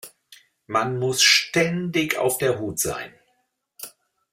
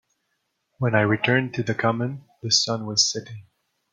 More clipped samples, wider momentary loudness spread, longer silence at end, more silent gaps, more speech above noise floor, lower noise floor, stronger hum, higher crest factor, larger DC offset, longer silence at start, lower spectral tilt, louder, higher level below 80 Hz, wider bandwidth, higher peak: neither; first, 24 LU vs 12 LU; about the same, 0.45 s vs 0.5 s; neither; about the same, 49 dB vs 52 dB; second, -71 dBFS vs -75 dBFS; neither; about the same, 20 dB vs 22 dB; neither; second, 0.05 s vs 0.8 s; about the same, -2.5 dB/octave vs -3.5 dB/octave; about the same, -21 LUFS vs -22 LUFS; about the same, -60 dBFS vs -64 dBFS; first, 16 kHz vs 9.6 kHz; about the same, -4 dBFS vs -4 dBFS